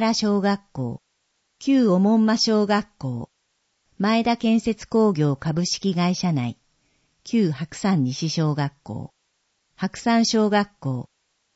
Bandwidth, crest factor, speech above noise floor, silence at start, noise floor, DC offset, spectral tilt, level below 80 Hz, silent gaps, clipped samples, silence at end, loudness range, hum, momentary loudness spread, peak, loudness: 8 kHz; 16 dB; 50 dB; 0 s; -71 dBFS; under 0.1%; -5.5 dB/octave; -58 dBFS; none; under 0.1%; 0.55 s; 4 LU; none; 13 LU; -6 dBFS; -22 LUFS